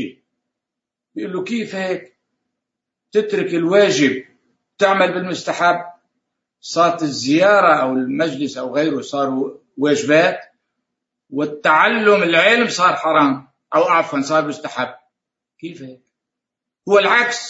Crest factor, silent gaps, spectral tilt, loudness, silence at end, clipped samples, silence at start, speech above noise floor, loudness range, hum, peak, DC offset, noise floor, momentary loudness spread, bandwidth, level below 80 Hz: 18 dB; none; -4 dB/octave; -16 LUFS; 0 s; under 0.1%; 0 s; 68 dB; 6 LU; none; 0 dBFS; under 0.1%; -84 dBFS; 16 LU; 8 kHz; -70 dBFS